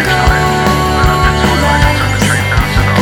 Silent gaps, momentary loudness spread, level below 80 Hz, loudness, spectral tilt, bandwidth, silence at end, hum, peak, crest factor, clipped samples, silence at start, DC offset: none; 2 LU; -18 dBFS; -11 LUFS; -5 dB/octave; 19.5 kHz; 0 s; none; 0 dBFS; 10 dB; under 0.1%; 0 s; under 0.1%